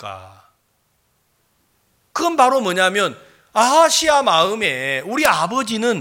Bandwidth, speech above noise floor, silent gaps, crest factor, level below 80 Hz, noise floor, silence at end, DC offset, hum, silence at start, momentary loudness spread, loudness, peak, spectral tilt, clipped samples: 17 kHz; 48 dB; none; 18 dB; -58 dBFS; -65 dBFS; 0 s; under 0.1%; none; 0 s; 10 LU; -16 LUFS; 0 dBFS; -2.5 dB/octave; under 0.1%